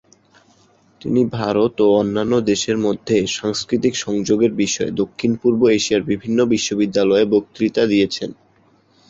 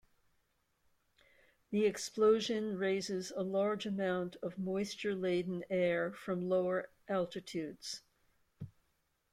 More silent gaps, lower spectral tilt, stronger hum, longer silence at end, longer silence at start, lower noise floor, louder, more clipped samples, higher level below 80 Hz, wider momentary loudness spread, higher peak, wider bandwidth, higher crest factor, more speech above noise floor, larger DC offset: neither; about the same, -5 dB/octave vs -5 dB/octave; neither; first, 0.75 s vs 0.6 s; second, 1.05 s vs 1.7 s; second, -56 dBFS vs -79 dBFS; first, -18 LUFS vs -36 LUFS; neither; first, -52 dBFS vs -74 dBFS; second, 6 LU vs 11 LU; first, -4 dBFS vs -18 dBFS; second, 8 kHz vs 15 kHz; about the same, 16 dB vs 18 dB; second, 38 dB vs 44 dB; neither